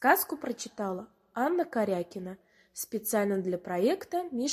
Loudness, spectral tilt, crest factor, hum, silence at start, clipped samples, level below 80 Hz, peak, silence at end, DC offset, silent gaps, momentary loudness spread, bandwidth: -31 LUFS; -4.5 dB/octave; 22 dB; none; 0 s; under 0.1%; -72 dBFS; -8 dBFS; 0 s; under 0.1%; none; 13 LU; 16 kHz